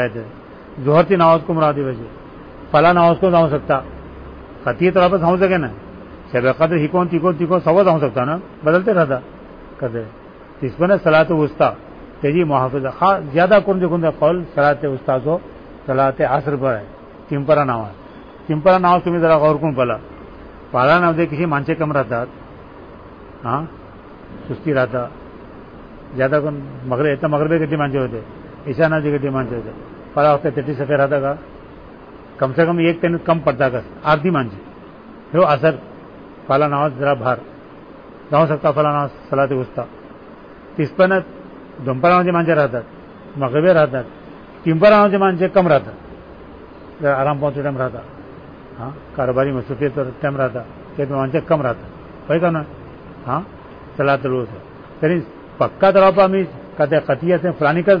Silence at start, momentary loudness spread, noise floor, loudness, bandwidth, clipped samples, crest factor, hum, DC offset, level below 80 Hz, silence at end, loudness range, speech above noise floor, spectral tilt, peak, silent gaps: 0 s; 22 LU; -39 dBFS; -17 LUFS; 5.2 kHz; under 0.1%; 16 dB; none; 0.1%; -46 dBFS; 0 s; 6 LU; 23 dB; -9.5 dB/octave; -2 dBFS; none